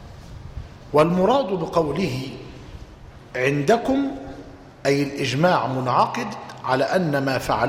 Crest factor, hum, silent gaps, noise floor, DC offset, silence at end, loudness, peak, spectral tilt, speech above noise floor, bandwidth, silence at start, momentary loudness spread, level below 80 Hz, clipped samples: 18 dB; none; none; -43 dBFS; under 0.1%; 0 s; -21 LUFS; -6 dBFS; -6 dB/octave; 22 dB; 16 kHz; 0 s; 20 LU; -46 dBFS; under 0.1%